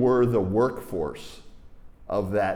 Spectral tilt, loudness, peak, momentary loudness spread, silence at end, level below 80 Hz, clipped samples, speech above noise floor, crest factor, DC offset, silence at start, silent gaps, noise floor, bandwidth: -8 dB/octave; -25 LUFS; -12 dBFS; 15 LU; 0 s; -50 dBFS; under 0.1%; 21 dB; 14 dB; under 0.1%; 0 s; none; -45 dBFS; 15.5 kHz